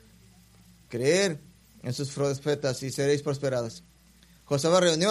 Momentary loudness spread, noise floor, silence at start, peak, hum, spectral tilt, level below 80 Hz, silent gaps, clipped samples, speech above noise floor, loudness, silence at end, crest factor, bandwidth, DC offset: 16 LU; -57 dBFS; 0.9 s; -10 dBFS; none; -4.5 dB/octave; -62 dBFS; none; under 0.1%; 31 dB; -27 LUFS; 0 s; 18 dB; 15 kHz; under 0.1%